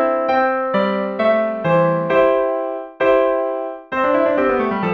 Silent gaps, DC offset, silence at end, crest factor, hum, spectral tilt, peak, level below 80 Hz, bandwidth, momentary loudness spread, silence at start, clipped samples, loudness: none; under 0.1%; 0 s; 14 dB; none; -8 dB/octave; -4 dBFS; -52 dBFS; 6 kHz; 7 LU; 0 s; under 0.1%; -17 LUFS